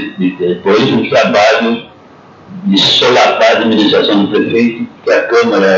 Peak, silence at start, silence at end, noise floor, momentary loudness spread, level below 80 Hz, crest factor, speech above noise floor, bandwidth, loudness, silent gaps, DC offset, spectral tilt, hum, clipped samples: 0 dBFS; 0 s; 0 s; -38 dBFS; 8 LU; -56 dBFS; 10 dB; 28 dB; 7.8 kHz; -10 LUFS; none; under 0.1%; -4.5 dB/octave; none; under 0.1%